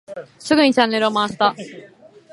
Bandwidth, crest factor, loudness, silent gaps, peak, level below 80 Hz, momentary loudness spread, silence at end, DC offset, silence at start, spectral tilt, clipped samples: 11.5 kHz; 18 dB; -17 LUFS; none; 0 dBFS; -62 dBFS; 20 LU; 0.45 s; under 0.1%; 0.1 s; -4 dB/octave; under 0.1%